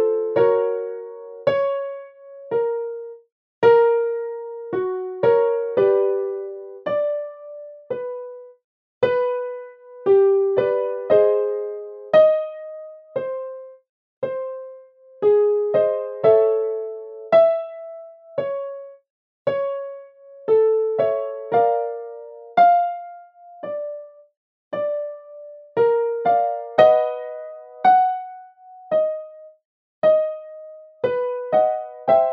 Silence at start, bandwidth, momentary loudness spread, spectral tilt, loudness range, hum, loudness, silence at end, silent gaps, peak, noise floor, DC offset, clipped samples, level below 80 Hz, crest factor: 0 s; 5.4 kHz; 20 LU; -8 dB/octave; 6 LU; none; -20 LUFS; 0 s; 3.32-3.62 s, 8.64-9.01 s, 13.89-14.22 s, 19.10-19.45 s, 24.37-24.71 s, 29.65-30.02 s; 0 dBFS; -46 dBFS; under 0.1%; under 0.1%; -72 dBFS; 20 dB